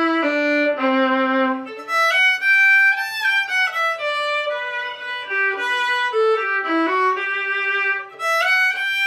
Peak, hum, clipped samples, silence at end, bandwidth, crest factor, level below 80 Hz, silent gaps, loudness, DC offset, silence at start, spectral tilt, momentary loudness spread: -6 dBFS; none; under 0.1%; 0 s; 16 kHz; 12 dB; -78 dBFS; none; -18 LUFS; under 0.1%; 0 s; -1 dB/octave; 9 LU